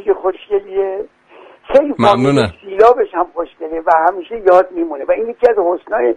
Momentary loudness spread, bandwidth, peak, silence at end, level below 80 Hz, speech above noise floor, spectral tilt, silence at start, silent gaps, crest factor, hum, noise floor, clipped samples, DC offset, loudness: 10 LU; 10.5 kHz; 0 dBFS; 0 s; -48 dBFS; 29 dB; -7 dB/octave; 0.05 s; none; 14 dB; none; -42 dBFS; under 0.1%; under 0.1%; -14 LUFS